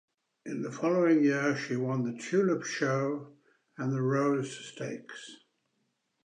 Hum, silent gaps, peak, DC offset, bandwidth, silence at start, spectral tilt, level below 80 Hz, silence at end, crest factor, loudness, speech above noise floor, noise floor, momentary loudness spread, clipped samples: none; none; -14 dBFS; under 0.1%; 10 kHz; 0.45 s; -6 dB/octave; -82 dBFS; 0.9 s; 16 dB; -30 LUFS; 49 dB; -78 dBFS; 16 LU; under 0.1%